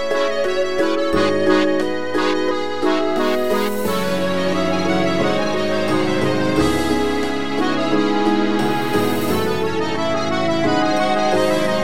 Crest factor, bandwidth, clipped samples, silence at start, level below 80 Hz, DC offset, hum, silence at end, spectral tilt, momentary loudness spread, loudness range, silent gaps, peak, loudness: 14 dB; 17 kHz; under 0.1%; 0 s; -44 dBFS; 5%; none; 0 s; -5 dB/octave; 3 LU; 1 LU; none; -2 dBFS; -19 LUFS